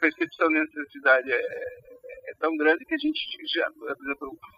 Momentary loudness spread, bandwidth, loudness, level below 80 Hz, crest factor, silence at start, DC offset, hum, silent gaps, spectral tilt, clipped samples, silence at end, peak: 15 LU; 7 kHz; -26 LUFS; -68 dBFS; 20 dB; 0 s; under 0.1%; none; none; -5 dB/octave; under 0.1%; 0.1 s; -8 dBFS